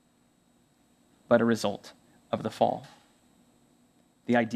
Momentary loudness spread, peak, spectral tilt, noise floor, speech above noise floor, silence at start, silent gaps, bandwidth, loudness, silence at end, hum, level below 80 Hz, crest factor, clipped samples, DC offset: 19 LU; -6 dBFS; -6 dB/octave; -66 dBFS; 39 dB; 1.3 s; none; 14 kHz; -28 LUFS; 0 s; none; -72 dBFS; 24 dB; under 0.1%; under 0.1%